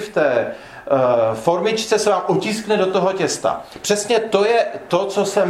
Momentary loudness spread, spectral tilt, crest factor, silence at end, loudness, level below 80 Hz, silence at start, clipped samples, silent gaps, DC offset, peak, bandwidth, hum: 5 LU; -4 dB/octave; 16 dB; 0 s; -18 LUFS; -58 dBFS; 0 s; under 0.1%; none; under 0.1%; -2 dBFS; 15.5 kHz; none